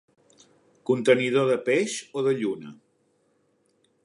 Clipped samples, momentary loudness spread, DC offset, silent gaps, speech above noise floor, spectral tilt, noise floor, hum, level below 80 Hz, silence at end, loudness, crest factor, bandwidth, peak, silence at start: under 0.1%; 16 LU; under 0.1%; none; 44 dB; -5 dB/octave; -68 dBFS; none; -78 dBFS; 1.3 s; -24 LUFS; 22 dB; 11 kHz; -6 dBFS; 0.9 s